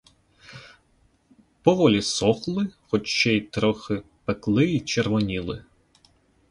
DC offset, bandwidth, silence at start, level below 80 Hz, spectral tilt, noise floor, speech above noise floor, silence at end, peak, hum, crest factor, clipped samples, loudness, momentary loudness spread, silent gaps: under 0.1%; 11.5 kHz; 0.5 s; -52 dBFS; -5 dB/octave; -63 dBFS; 40 dB; 0.9 s; -4 dBFS; none; 22 dB; under 0.1%; -23 LUFS; 13 LU; none